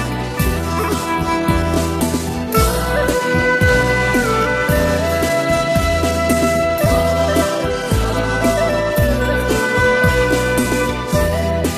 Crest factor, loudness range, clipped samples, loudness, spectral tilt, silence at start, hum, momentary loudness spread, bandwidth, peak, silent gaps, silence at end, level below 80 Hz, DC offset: 14 dB; 1 LU; under 0.1%; -16 LUFS; -5 dB/octave; 0 s; none; 5 LU; 14.5 kHz; -2 dBFS; none; 0 s; -26 dBFS; under 0.1%